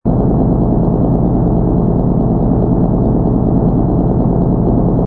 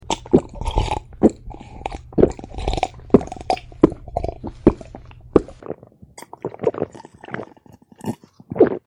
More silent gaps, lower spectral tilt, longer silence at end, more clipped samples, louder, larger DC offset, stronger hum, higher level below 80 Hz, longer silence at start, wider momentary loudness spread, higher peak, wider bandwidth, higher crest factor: neither; first, -14 dB/octave vs -7 dB/octave; about the same, 0 s vs 0.1 s; neither; first, -13 LUFS vs -21 LUFS; neither; neither; first, -20 dBFS vs -34 dBFS; about the same, 0.05 s vs 0.05 s; second, 1 LU vs 18 LU; about the same, 0 dBFS vs 0 dBFS; second, 2 kHz vs 11.5 kHz; second, 12 dB vs 22 dB